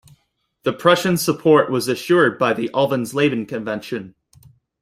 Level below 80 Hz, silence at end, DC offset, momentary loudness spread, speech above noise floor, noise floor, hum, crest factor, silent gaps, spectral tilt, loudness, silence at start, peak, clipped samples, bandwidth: -60 dBFS; 0.7 s; under 0.1%; 11 LU; 49 dB; -67 dBFS; none; 18 dB; none; -5 dB/octave; -18 LUFS; 0.65 s; -2 dBFS; under 0.1%; 16 kHz